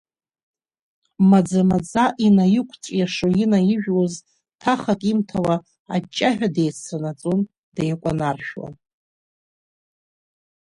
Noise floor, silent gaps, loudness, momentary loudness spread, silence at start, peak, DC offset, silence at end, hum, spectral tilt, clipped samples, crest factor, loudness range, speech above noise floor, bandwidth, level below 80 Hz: under -90 dBFS; 5.79-5.85 s, 7.58-7.72 s; -20 LUFS; 12 LU; 1.2 s; -4 dBFS; under 0.1%; 1.9 s; none; -6.5 dB/octave; under 0.1%; 18 dB; 9 LU; over 71 dB; 11 kHz; -54 dBFS